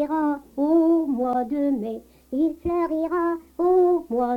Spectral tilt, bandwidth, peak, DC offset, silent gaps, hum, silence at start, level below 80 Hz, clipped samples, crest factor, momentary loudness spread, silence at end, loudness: -8 dB/octave; 4.8 kHz; -10 dBFS; under 0.1%; none; none; 0 s; -52 dBFS; under 0.1%; 12 dB; 8 LU; 0 s; -23 LUFS